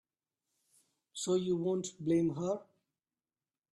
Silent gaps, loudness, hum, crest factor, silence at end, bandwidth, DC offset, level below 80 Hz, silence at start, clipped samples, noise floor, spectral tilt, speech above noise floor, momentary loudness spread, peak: none; -34 LUFS; none; 16 dB; 1.1 s; 12 kHz; under 0.1%; -74 dBFS; 1.15 s; under 0.1%; under -90 dBFS; -6 dB/octave; over 57 dB; 9 LU; -20 dBFS